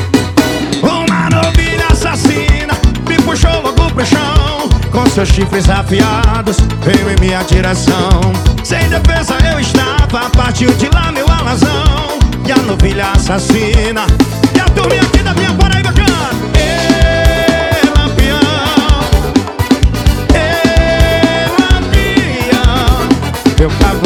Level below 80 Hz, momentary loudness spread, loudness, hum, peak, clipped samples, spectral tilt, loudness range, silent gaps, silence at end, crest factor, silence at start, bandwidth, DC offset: -14 dBFS; 3 LU; -11 LUFS; none; 0 dBFS; 0.2%; -5.5 dB/octave; 1 LU; none; 0 s; 10 dB; 0 s; 17 kHz; under 0.1%